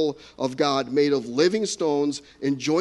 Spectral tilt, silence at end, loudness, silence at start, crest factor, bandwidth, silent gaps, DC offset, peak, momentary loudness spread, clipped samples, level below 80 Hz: -4.5 dB/octave; 0 s; -24 LUFS; 0 s; 16 dB; 11.5 kHz; none; under 0.1%; -6 dBFS; 7 LU; under 0.1%; -64 dBFS